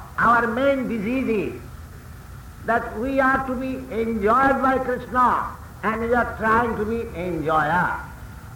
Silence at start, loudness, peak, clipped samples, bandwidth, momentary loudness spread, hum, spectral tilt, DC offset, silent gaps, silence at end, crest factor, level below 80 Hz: 0 s; -22 LUFS; -8 dBFS; under 0.1%; 18.5 kHz; 20 LU; none; -6.5 dB/octave; under 0.1%; none; 0 s; 14 dB; -42 dBFS